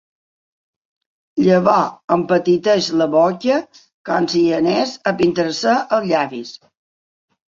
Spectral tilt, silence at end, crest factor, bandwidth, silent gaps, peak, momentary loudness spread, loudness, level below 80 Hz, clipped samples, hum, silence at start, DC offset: -5.5 dB/octave; 0.9 s; 16 dB; 7.6 kHz; 2.04-2.08 s, 3.94-4.05 s; -2 dBFS; 7 LU; -17 LUFS; -60 dBFS; under 0.1%; none; 1.35 s; under 0.1%